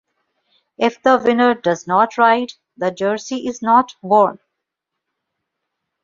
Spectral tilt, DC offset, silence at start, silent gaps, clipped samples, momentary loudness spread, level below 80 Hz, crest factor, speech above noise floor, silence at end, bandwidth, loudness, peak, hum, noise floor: -5 dB/octave; under 0.1%; 0.8 s; none; under 0.1%; 9 LU; -64 dBFS; 16 dB; 64 dB; 1.7 s; 7.6 kHz; -17 LUFS; -2 dBFS; none; -80 dBFS